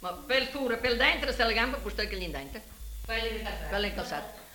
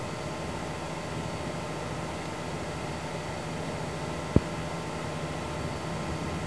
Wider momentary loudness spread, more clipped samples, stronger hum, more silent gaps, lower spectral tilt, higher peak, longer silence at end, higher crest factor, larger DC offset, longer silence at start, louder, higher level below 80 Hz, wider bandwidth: first, 15 LU vs 7 LU; neither; neither; neither; second, -3.5 dB/octave vs -5.5 dB/octave; second, -12 dBFS vs -4 dBFS; about the same, 0 s vs 0 s; second, 20 dB vs 30 dB; second, under 0.1% vs 0.3%; about the same, 0 s vs 0 s; first, -29 LUFS vs -34 LUFS; about the same, -42 dBFS vs -46 dBFS; first, 18 kHz vs 11 kHz